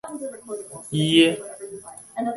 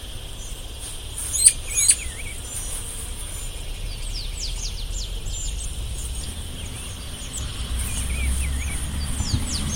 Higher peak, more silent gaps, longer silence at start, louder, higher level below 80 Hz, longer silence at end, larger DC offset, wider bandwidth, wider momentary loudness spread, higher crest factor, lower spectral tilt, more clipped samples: second, -4 dBFS vs 0 dBFS; neither; about the same, 0.05 s vs 0 s; first, -21 LUFS vs -25 LUFS; second, -62 dBFS vs -30 dBFS; about the same, 0 s vs 0 s; neither; second, 11.5 kHz vs 16.5 kHz; first, 20 LU vs 17 LU; second, 20 dB vs 26 dB; first, -4.5 dB/octave vs -2 dB/octave; neither